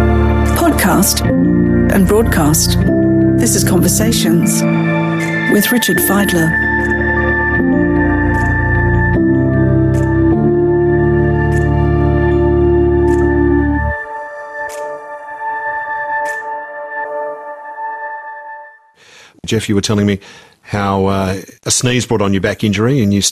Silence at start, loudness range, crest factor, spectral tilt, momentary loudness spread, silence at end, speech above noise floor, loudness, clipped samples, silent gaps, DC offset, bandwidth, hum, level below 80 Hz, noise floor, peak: 0 s; 10 LU; 12 dB; -5 dB/octave; 13 LU; 0 s; 31 dB; -13 LUFS; under 0.1%; none; under 0.1%; 14.5 kHz; none; -26 dBFS; -43 dBFS; 0 dBFS